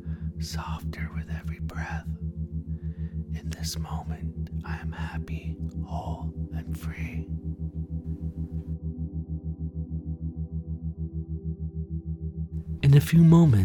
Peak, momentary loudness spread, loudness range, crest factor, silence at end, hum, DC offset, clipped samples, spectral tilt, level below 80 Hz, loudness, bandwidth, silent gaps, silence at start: -8 dBFS; 11 LU; 6 LU; 20 dB; 0 s; none; under 0.1%; under 0.1%; -7.5 dB/octave; -38 dBFS; -29 LUFS; 18 kHz; none; 0 s